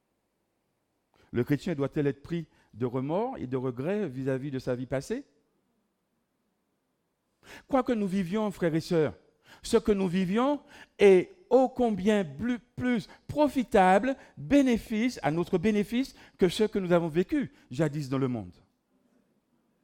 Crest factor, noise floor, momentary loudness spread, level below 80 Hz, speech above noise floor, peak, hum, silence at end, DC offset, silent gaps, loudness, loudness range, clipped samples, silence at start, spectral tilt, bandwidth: 20 dB; -78 dBFS; 12 LU; -56 dBFS; 50 dB; -8 dBFS; none; 1.35 s; under 0.1%; none; -28 LUFS; 9 LU; under 0.1%; 1.35 s; -6.5 dB/octave; 16 kHz